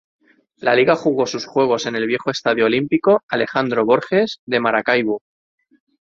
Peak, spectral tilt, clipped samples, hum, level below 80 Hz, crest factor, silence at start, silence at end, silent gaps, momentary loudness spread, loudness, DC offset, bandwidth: 0 dBFS; -5 dB/octave; under 0.1%; none; -62 dBFS; 18 dB; 0.6 s; 0.95 s; 3.23-3.28 s, 4.39-4.47 s; 5 LU; -18 LUFS; under 0.1%; 7.6 kHz